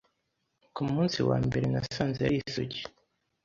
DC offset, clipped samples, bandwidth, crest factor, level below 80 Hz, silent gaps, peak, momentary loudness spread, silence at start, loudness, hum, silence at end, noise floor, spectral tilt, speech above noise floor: under 0.1%; under 0.1%; 7.6 kHz; 20 dB; -54 dBFS; none; -12 dBFS; 11 LU; 0.75 s; -30 LUFS; none; 0.55 s; -79 dBFS; -6.5 dB/octave; 50 dB